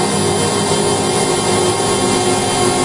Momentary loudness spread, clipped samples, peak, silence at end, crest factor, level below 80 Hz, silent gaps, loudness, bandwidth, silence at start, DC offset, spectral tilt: 1 LU; under 0.1%; -2 dBFS; 0 s; 14 dB; -44 dBFS; none; -14 LUFS; 11.5 kHz; 0 s; under 0.1%; -3.5 dB/octave